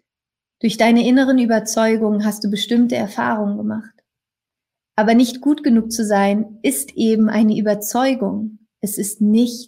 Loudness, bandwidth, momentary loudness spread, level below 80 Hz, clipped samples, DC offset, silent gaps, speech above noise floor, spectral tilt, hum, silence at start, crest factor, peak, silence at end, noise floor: -17 LUFS; 16 kHz; 9 LU; -60 dBFS; under 0.1%; under 0.1%; none; 71 dB; -5 dB/octave; none; 0.65 s; 16 dB; -2 dBFS; 0.05 s; -88 dBFS